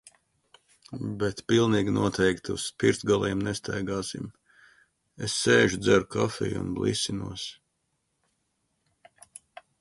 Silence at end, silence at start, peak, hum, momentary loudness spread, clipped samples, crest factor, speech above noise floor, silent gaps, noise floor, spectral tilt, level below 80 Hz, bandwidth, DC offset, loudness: 2.25 s; 0.9 s; -8 dBFS; none; 15 LU; under 0.1%; 20 dB; 50 dB; none; -77 dBFS; -4.5 dB/octave; -54 dBFS; 11.5 kHz; under 0.1%; -26 LUFS